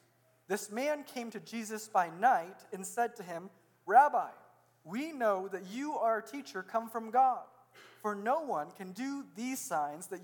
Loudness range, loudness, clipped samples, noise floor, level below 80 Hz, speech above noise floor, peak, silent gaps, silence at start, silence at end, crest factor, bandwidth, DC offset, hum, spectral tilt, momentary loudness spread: 3 LU; -34 LUFS; under 0.1%; -65 dBFS; under -90 dBFS; 32 dB; -12 dBFS; none; 0.5 s; 0 s; 22 dB; 19 kHz; under 0.1%; none; -4 dB/octave; 14 LU